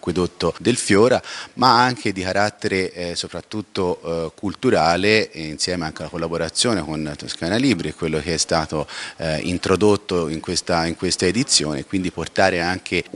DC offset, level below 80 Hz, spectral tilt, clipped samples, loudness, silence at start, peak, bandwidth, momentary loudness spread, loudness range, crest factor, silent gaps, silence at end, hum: under 0.1%; -50 dBFS; -4 dB/octave; under 0.1%; -20 LUFS; 0.05 s; 0 dBFS; 12 kHz; 11 LU; 3 LU; 20 dB; none; 0.15 s; none